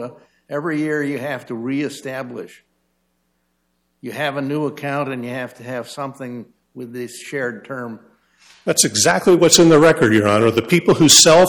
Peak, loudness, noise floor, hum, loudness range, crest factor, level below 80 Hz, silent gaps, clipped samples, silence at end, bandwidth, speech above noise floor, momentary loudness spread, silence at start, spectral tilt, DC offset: 0 dBFS; -15 LUFS; -68 dBFS; none; 14 LU; 18 dB; -54 dBFS; none; under 0.1%; 0 s; 17.5 kHz; 51 dB; 22 LU; 0 s; -3.5 dB/octave; under 0.1%